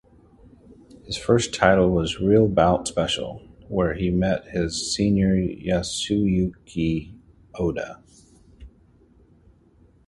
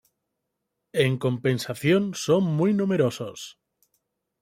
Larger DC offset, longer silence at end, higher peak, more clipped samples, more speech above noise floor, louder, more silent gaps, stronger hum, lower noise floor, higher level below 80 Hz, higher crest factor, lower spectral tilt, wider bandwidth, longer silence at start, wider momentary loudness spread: neither; first, 1.4 s vs 0.9 s; first, 0 dBFS vs -8 dBFS; neither; second, 35 dB vs 57 dB; about the same, -22 LUFS vs -24 LUFS; neither; neither; second, -56 dBFS vs -81 dBFS; first, -42 dBFS vs -64 dBFS; about the same, 22 dB vs 18 dB; about the same, -5.5 dB/octave vs -6 dB/octave; second, 11.5 kHz vs 16 kHz; about the same, 1.05 s vs 0.95 s; about the same, 11 LU vs 12 LU